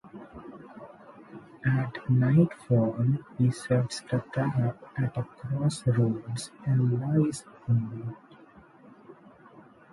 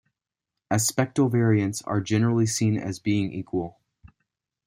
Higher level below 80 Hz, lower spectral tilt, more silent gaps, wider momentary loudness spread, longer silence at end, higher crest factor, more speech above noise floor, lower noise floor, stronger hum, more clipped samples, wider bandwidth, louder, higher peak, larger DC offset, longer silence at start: about the same, -60 dBFS vs -60 dBFS; first, -7.5 dB/octave vs -5.5 dB/octave; neither; first, 21 LU vs 8 LU; second, 0.8 s vs 0.95 s; about the same, 18 dB vs 18 dB; second, 27 dB vs 63 dB; second, -54 dBFS vs -86 dBFS; neither; neither; second, 11.5 kHz vs 16 kHz; second, -28 LUFS vs -24 LUFS; about the same, -10 dBFS vs -8 dBFS; neither; second, 0.05 s vs 0.7 s